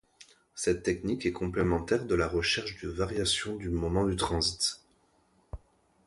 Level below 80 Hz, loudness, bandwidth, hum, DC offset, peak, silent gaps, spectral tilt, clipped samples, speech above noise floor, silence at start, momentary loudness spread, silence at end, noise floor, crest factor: -46 dBFS; -30 LUFS; 12 kHz; none; under 0.1%; -14 dBFS; none; -4 dB/octave; under 0.1%; 38 dB; 0.2 s; 19 LU; 0.5 s; -68 dBFS; 18 dB